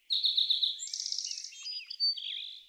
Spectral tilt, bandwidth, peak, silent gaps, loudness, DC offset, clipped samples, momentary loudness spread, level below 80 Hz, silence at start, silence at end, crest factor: 8.5 dB/octave; 16 kHz; -16 dBFS; none; -30 LUFS; under 0.1%; under 0.1%; 12 LU; under -90 dBFS; 0.1 s; 0.05 s; 18 dB